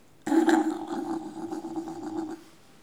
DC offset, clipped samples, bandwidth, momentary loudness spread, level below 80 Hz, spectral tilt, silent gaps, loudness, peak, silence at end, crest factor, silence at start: 0.1%; under 0.1%; 14 kHz; 14 LU; -72 dBFS; -4.5 dB/octave; none; -29 LUFS; -8 dBFS; 0.35 s; 20 dB; 0.25 s